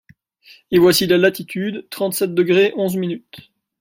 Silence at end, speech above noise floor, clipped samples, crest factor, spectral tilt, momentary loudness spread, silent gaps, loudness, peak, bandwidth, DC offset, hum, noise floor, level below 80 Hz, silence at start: 0.4 s; 32 dB; under 0.1%; 16 dB; -5 dB/octave; 12 LU; none; -17 LUFS; -2 dBFS; 16.5 kHz; under 0.1%; none; -49 dBFS; -56 dBFS; 0.7 s